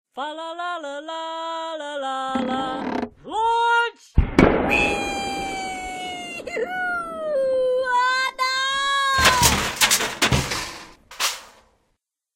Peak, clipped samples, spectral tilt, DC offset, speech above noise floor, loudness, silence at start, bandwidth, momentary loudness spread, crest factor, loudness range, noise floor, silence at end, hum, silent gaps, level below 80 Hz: 0 dBFS; under 0.1%; -3 dB/octave; under 0.1%; 44 dB; -22 LUFS; 0.15 s; 16 kHz; 13 LU; 22 dB; 6 LU; -73 dBFS; 0.85 s; none; none; -36 dBFS